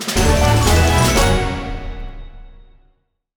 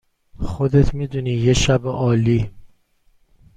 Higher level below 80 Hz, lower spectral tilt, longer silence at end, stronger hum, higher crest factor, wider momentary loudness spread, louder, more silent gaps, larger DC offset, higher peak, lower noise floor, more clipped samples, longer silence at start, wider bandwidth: first, -22 dBFS vs -32 dBFS; second, -4.5 dB/octave vs -6 dB/octave; about the same, 0.85 s vs 0.9 s; neither; about the same, 16 dB vs 16 dB; first, 19 LU vs 12 LU; first, -15 LUFS vs -19 LUFS; neither; neither; about the same, -2 dBFS vs -2 dBFS; about the same, -60 dBFS vs -58 dBFS; neither; second, 0 s vs 0.35 s; first, over 20 kHz vs 9.4 kHz